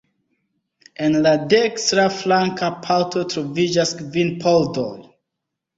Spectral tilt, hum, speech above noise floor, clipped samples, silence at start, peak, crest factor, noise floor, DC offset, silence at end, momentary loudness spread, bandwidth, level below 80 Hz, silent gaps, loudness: -4.5 dB/octave; none; 62 dB; under 0.1%; 1 s; -2 dBFS; 18 dB; -81 dBFS; under 0.1%; 0.75 s; 8 LU; 8 kHz; -58 dBFS; none; -19 LUFS